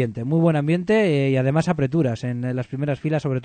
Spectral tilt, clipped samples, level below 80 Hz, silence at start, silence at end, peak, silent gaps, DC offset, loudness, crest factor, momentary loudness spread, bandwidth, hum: -8 dB/octave; under 0.1%; -54 dBFS; 0 s; 0 s; -4 dBFS; none; under 0.1%; -21 LUFS; 16 dB; 7 LU; 9.2 kHz; none